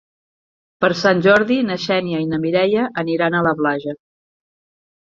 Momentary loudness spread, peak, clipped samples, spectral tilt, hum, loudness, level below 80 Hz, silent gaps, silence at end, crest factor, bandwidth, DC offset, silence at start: 8 LU; -2 dBFS; under 0.1%; -6 dB/octave; none; -17 LUFS; -58 dBFS; none; 1.1 s; 18 dB; 7.6 kHz; under 0.1%; 0.8 s